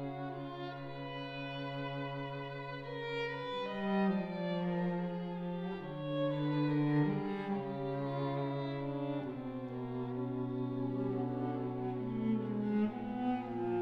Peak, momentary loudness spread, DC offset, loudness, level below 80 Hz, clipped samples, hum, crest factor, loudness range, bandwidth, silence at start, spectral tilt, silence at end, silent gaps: -22 dBFS; 9 LU; under 0.1%; -38 LUFS; -66 dBFS; under 0.1%; none; 16 dB; 3 LU; 6.2 kHz; 0 s; -9 dB/octave; 0 s; none